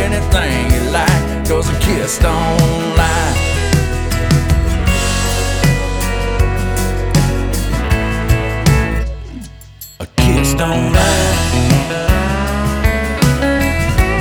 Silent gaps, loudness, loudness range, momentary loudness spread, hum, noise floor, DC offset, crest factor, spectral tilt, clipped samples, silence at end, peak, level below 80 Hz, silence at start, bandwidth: none; -15 LUFS; 2 LU; 5 LU; none; -35 dBFS; under 0.1%; 14 dB; -5 dB/octave; under 0.1%; 0 s; 0 dBFS; -18 dBFS; 0 s; over 20 kHz